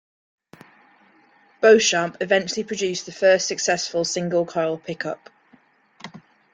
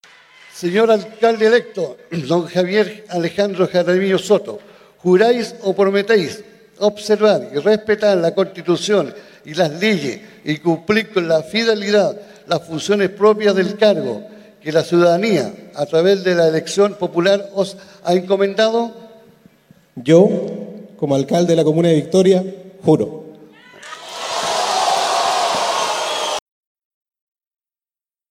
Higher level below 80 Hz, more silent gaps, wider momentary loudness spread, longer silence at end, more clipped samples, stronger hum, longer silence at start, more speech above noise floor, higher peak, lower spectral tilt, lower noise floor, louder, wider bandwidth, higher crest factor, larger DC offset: about the same, -68 dBFS vs -64 dBFS; neither; first, 20 LU vs 12 LU; second, 0.35 s vs 1.9 s; neither; neither; first, 1.6 s vs 0.55 s; second, 37 dB vs over 74 dB; about the same, -2 dBFS vs 0 dBFS; second, -3 dB/octave vs -5 dB/octave; second, -57 dBFS vs under -90 dBFS; second, -21 LUFS vs -17 LUFS; second, 9.6 kHz vs 15.5 kHz; about the same, 20 dB vs 18 dB; neither